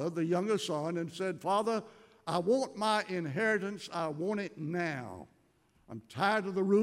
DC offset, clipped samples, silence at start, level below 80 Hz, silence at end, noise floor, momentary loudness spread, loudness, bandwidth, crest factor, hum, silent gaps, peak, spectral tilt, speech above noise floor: under 0.1%; under 0.1%; 0 s; -78 dBFS; 0 s; -69 dBFS; 12 LU; -33 LUFS; 14.5 kHz; 18 dB; none; none; -16 dBFS; -5.5 dB/octave; 37 dB